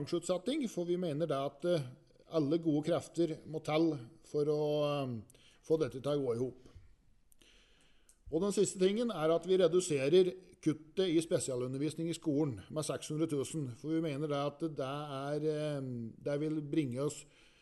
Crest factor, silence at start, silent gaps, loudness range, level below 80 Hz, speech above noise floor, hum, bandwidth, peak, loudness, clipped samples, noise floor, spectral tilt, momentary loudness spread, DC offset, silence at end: 18 dB; 0 s; none; 6 LU; -68 dBFS; 31 dB; none; 12 kHz; -16 dBFS; -35 LUFS; under 0.1%; -65 dBFS; -6 dB/octave; 9 LU; under 0.1%; 0.35 s